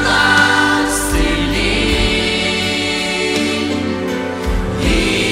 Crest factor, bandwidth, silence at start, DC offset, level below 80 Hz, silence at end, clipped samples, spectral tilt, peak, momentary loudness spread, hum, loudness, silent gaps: 16 dB; 16 kHz; 0 s; under 0.1%; -24 dBFS; 0 s; under 0.1%; -3.5 dB/octave; 0 dBFS; 9 LU; none; -15 LUFS; none